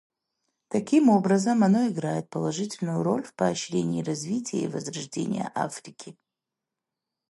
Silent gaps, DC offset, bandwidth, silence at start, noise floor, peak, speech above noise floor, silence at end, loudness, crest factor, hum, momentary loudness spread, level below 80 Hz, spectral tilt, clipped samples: none; under 0.1%; 11.5 kHz; 0.7 s; -87 dBFS; -8 dBFS; 62 dB; 1.2 s; -26 LUFS; 18 dB; none; 12 LU; -70 dBFS; -6 dB/octave; under 0.1%